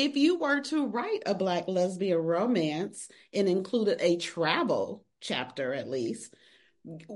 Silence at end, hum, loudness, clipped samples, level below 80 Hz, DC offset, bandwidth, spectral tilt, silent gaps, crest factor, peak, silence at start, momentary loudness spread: 0 s; none; -29 LUFS; under 0.1%; -78 dBFS; under 0.1%; 11.5 kHz; -5 dB/octave; none; 18 dB; -12 dBFS; 0 s; 11 LU